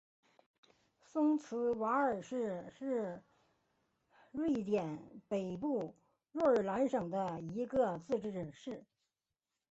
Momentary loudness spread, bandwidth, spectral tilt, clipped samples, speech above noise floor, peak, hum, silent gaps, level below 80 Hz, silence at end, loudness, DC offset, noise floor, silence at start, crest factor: 14 LU; 8 kHz; -6.5 dB/octave; under 0.1%; over 54 dB; -20 dBFS; none; none; -74 dBFS; 0.9 s; -37 LUFS; under 0.1%; under -90 dBFS; 1.15 s; 18 dB